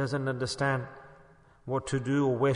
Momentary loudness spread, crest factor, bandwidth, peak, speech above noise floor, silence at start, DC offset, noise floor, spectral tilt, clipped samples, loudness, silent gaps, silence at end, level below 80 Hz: 18 LU; 16 dB; 10.5 kHz; -16 dBFS; 29 dB; 0 s; under 0.1%; -57 dBFS; -6 dB/octave; under 0.1%; -30 LUFS; none; 0 s; -60 dBFS